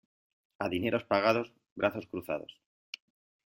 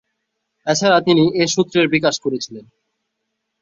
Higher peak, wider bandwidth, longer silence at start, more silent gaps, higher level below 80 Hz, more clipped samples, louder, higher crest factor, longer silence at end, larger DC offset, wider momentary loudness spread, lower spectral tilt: second, -12 dBFS vs -2 dBFS; first, 16 kHz vs 7.8 kHz; about the same, 0.6 s vs 0.65 s; first, 1.71-1.76 s vs none; second, -70 dBFS vs -58 dBFS; neither; second, -32 LUFS vs -16 LUFS; first, 22 dB vs 16 dB; about the same, 1.05 s vs 1 s; neither; first, 19 LU vs 13 LU; first, -6 dB/octave vs -4.5 dB/octave